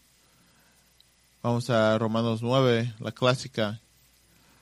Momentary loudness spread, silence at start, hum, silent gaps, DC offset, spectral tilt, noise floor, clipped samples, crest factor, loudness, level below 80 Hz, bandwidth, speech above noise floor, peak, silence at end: 10 LU; 1.45 s; 60 Hz at -45 dBFS; none; under 0.1%; -6 dB/octave; -62 dBFS; under 0.1%; 20 dB; -26 LUFS; -64 dBFS; 13.5 kHz; 37 dB; -8 dBFS; 0.85 s